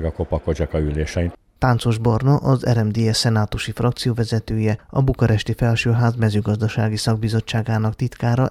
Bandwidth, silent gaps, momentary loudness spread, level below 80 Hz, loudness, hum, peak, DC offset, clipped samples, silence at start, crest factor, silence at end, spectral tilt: 13 kHz; none; 5 LU; -34 dBFS; -20 LUFS; none; -4 dBFS; under 0.1%; under 0.1%; 0 s; 16 dB; 0 s; -6.5 dB/octave